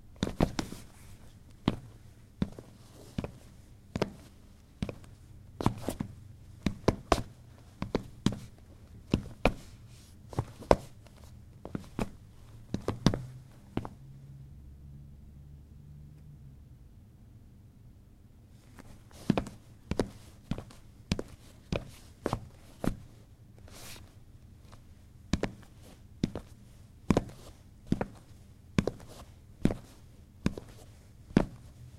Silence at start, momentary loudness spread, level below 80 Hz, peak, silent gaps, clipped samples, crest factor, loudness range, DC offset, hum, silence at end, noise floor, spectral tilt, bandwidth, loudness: 0.05 s; 24 LU; -46 dBFS; -2 dBFS; none; under 0.1%; 34 dB; 13 LU; under 0.1%; none; 0 s; -56 dBFS; -6.5 dB/octave; 16 kHz; -35 LUFS